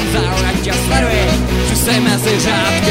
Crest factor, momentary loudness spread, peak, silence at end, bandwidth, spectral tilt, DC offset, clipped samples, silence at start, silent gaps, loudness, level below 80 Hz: 14 dB; 3 LU; 0 dBFS; 0 s; 16.5 kHz; -4 dB/octave; under 0.1%; under 0.1%; 0 s; none; -14 LUFS; -22 dBFS